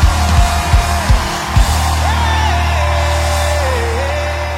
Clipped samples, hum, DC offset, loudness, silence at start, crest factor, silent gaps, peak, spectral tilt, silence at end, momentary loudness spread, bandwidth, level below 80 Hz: under 0.1%; none; under 0.1%; -14 LUFS; 0 s; 12 dB; none; 0 dBFS; -4.5 dB/octave; 0 s; 3 LU; 16 kHz; -16 dBFS